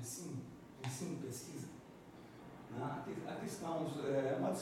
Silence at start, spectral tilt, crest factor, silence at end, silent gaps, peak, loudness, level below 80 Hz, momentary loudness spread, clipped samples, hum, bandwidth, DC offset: 0 s; -5.5 dB/octave; 16 dB; 0 s; none; -26 dBFS; -43 LUFS; -74 dBFS; 18 LU; under 0.1%; none; 17 kHz; under 0.1%